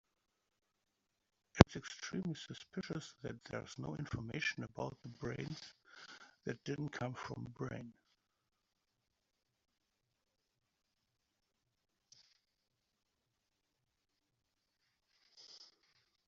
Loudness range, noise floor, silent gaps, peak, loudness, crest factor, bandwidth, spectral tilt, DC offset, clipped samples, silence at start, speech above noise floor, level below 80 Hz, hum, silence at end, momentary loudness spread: 12 LU; -86 dBFS; none; -4 dBFS; -40 LUFS; 40 dB; 8 kHz; -5.5 dB/octave; under 0.1%; under 0.1%; 1.55 s; 41 dB; -60 dBFS; none; 0.6 s; 21 LU